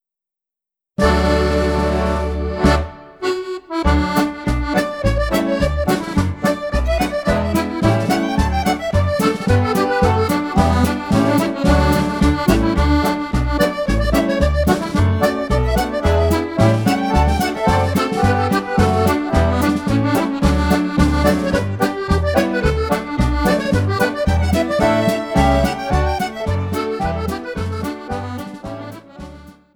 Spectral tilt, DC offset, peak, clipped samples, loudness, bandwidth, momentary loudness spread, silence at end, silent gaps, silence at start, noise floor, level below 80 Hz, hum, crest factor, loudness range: -6.5 dB/octave; under 0.1%; 0 dBFS; under 0.1%; -17 LUFS; over 20 kHz; 7 LU; 0.25 s; none; 1 s; -87 dBFS; -24 dBFS; none; 16 dB; 3 LU